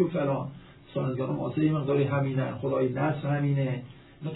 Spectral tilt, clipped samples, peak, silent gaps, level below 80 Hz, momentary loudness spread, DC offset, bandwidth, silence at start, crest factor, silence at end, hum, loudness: -12 dB/octave; under 0.1%; -12 dBFS; none; -60 dBFS; 11 LU; under 0.1%; 4.1 kHz; 0 s; 16 dB; 0 s; none; -28 LUFS